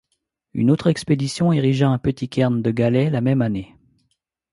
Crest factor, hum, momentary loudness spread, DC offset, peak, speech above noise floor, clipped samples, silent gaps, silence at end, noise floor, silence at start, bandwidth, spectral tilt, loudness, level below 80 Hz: 16 dB; none; 5 LU; under 0.1%; -4 dBFS; 55 dB; under 0.1%; none; 0.85 s; -74 dBFS; 0.55 s; 11.5 kHz; -7.5 dB/octave; -20 LUFS; -50 dBFS